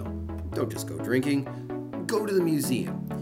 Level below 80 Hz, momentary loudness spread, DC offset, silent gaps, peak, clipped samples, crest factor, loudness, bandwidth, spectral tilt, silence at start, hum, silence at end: -48 dBFS; 10 LU; under 0.1%; none; -10 dBFS; under 0.1%; 18 dB; -29 LUFS; 16 kHz; -6 dB/octave; 0 s; none; 0 s